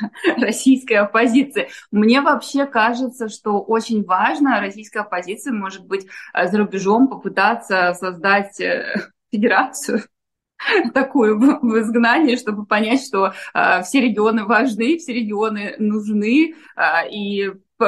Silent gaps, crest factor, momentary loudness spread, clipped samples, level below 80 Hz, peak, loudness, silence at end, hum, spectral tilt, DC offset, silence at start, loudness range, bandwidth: none; 18 dB; 10 LU; under 0.1%; -68 dBFS; 0 dBFS; -18 LUFS; 0 s; none; -4.5 dB/octave; under 0.1%; 0 s; 3 LU; 12.5 kHz